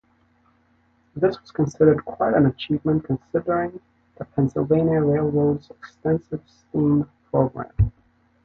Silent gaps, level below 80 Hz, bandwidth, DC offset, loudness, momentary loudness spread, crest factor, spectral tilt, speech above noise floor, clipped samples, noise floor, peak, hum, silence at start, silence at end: none; -40 dBFS; 6.8 kHz; under 0.1%; -22 LUFS; 11 LU; 20 dB; -9 dB/octave; 41 dB; under 0.1%; -62 dBFS; -4 dBFS; none; 1.15 s; 0.55 s